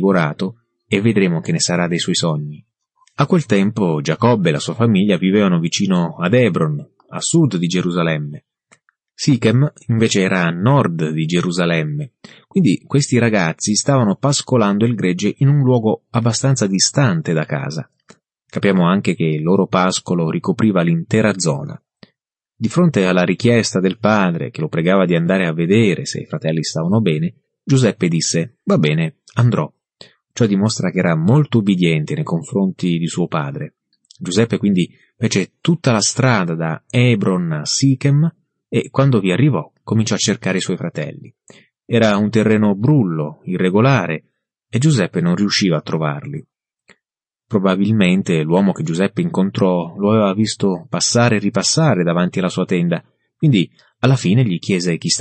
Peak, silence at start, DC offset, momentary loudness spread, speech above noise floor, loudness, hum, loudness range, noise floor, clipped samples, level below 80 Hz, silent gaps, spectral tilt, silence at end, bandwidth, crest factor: -2 dBFS; 0 s; under 0.1%; 8 LU; 70 dB; -16 LUFS; none; 3 LU; -86 dBFS; under 0.1%; -56 dBFS; none; -5.5 dB/octave; 0 s; 8.8 kHz; 14 dB